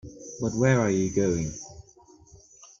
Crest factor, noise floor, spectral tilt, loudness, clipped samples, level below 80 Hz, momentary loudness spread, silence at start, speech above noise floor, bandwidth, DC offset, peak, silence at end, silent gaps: 20 dB; -55 dBFS; -6 dB/octave; -25 LUFS; under 0.1%; -52 dBFS; 19 LU; 0.05 s; 31 dB; 7.6 kHz; under 0.1%; -8 dBFS; 0.15 s; none